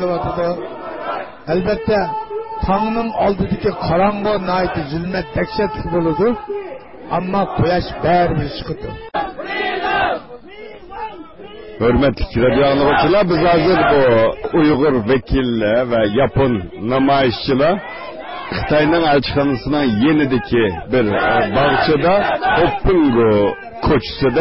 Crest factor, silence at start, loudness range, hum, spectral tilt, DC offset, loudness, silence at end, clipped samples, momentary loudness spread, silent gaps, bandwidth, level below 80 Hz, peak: 12 dB; 0 s; 6 LU; none; -11 dB/octave; under 0.1%; -16 LUFS; 0 s; under 0.1%; 13 LU; none; 5.8 kHz; -34 dBFS; -4 dBFS